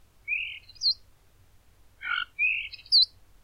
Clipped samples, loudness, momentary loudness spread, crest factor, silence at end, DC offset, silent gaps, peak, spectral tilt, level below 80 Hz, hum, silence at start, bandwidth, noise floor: under 0.1%; -25 LUFS; 13 LU; 18 dB; 0.35 s; under 0.1%; none; -12 dBFS; 2 dB/octave; -62 dBFS; none; 0.25 s; 16 kHz; -58 dBFS